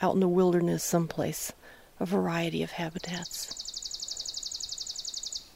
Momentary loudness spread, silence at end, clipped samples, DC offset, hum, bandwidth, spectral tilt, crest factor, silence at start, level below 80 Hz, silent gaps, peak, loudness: 11 LU; 0.05 s; under 0.1%; under 0.1%; none; 16 kHz; -4.5 dB/octave; 18 dB; 0 s; -60 dBFS; none; -12 dBFS; -31 LUFS